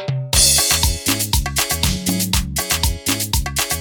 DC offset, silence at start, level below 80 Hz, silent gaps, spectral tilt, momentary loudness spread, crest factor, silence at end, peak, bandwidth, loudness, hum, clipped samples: under 0.1%; 0 s; -26 dBFS; none; -2 dB/octave; 8 LU; 18 dB; 0 s; 0 dBFS; 19.5 kHz; -16 LUFS; none; under 0.1%